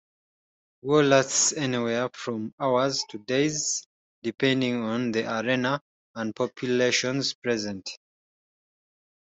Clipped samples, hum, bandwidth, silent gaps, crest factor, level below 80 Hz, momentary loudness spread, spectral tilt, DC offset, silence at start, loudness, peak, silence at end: under 0.1%; none; 8.2 kHz; 2.53-2.58 s, 3.86-4.22 s, 5.81-6.14 s, 7.35-7.42 s; 20 dB; -68 dBFS; 13 LU; -3.5 dB/octave; under 0.1%; 0.85 s; -25 LUFS; -6 dBFS; 1.25 s